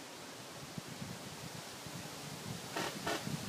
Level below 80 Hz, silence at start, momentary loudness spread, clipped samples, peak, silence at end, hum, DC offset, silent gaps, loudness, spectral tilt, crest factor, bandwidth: -72 dBFS; 0 s; 9 LU; under 0.1%; -24 dBFS; 0 s; none; under 0.1%; none; -43 LUFS; -3.5 dB/octave; 20 dB; 15.5 kHz